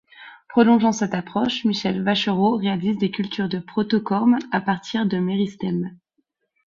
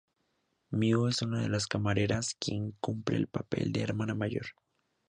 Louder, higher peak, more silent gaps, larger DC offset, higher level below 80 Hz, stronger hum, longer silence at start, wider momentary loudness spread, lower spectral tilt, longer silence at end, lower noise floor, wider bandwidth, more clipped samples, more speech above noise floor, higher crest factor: first, -21 LUFS vs -32 LUFS; first, -2 dBFS vs -14 dBFS; neither; neither; about the same, -60 dBFS vs -58 dBFS; neither; second, 0.2 s vs 0.7 s; about the same, 8 LU vs 7 LU; about the same, -6 dB/octave vs -5.5 dB/octave; about the same, 0.7 s vs 0.6 s; second, -72 dBFS vs -78 dBFS; second, 7.4 kHz vs 10 kHz; neither; first, 51 dB vs 46 dB; about the same, 18 dB vs 18 dB